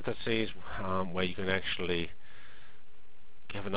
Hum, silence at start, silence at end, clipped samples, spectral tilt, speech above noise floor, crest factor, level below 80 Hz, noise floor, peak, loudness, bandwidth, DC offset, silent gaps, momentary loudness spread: none; 0 s; 0 s; under 0.1%; -3 dB/octave; 27 dB; 22 dB; -54 dBFS; -61 dBFS; -14 dBFS; -34 LUFS; 4 kHz; 2%; none; 23 LU